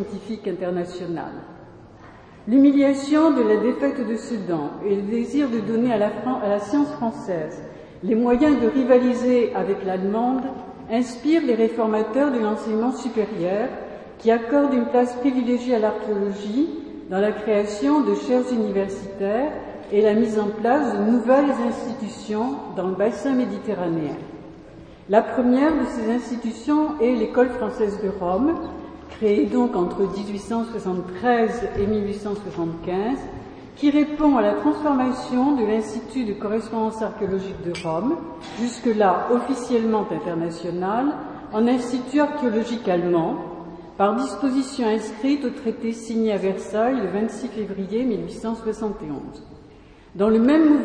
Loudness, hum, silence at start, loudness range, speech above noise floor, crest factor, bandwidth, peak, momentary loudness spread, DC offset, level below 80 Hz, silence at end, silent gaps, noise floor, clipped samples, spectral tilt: -22 LUFS; none; 0 s; 4 LU; 26 dB; 20 dB; 10 kHz; -2 dBFS; 11 LU; under 0.1%; -52 dBFS; 0 s; none; -47 dBFS; under 0.1%; -6.5 dB/octave